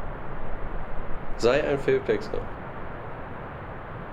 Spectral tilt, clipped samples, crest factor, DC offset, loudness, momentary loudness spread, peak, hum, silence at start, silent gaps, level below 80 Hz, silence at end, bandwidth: -6 dB/octave; under 0.1%; 18 dB; under 0.1%; -30 LUFS; 14 LU; -8 dBFS; none; 0 s; none; -36 dBFS; 0 s; 9.2 kHz